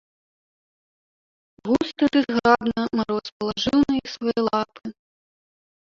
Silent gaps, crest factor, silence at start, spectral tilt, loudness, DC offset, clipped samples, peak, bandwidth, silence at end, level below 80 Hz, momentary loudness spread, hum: 3.32-3.40 s; 22 dB; 1.65 s; -5.5 dB/octave; -22 LUFS; under 0.1%; under 0.1%; -2 dBFS; 7.4 kHz; 1 s; -54 dBFS; 11 LU; none